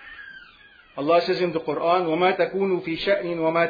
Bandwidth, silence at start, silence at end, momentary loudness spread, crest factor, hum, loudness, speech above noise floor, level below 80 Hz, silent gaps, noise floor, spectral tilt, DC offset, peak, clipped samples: 5 kHz; 0 s; 0 s; 19 LU; 16 dB; none; -23 LUFS; 29 dB; -60 dBFS; none; -51 dBFS; -7 dB/octave; under 0.1%; -8 dBFS; under 0.1%